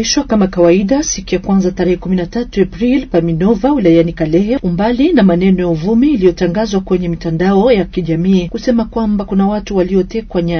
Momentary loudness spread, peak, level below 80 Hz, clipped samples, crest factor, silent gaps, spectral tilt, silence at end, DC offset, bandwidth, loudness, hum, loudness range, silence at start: 6 LU; 0 dBFS; -32 dBFS; under 0.1%; 12 dB; none; -6 dB/octave; 0 s; under 0.1%; 6.6 kHz; -13 LUFS; none; 2 LU; 0 s